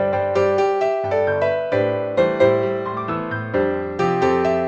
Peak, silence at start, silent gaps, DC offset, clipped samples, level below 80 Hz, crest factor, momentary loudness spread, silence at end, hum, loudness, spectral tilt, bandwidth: -4 dBFS; 0 s; none; under 0.1%; under 0.1%; -52 dBFS; 16 dB; 7 LU; 0 s; none; -20 LUFS; -7 dB/octave; 8 kHz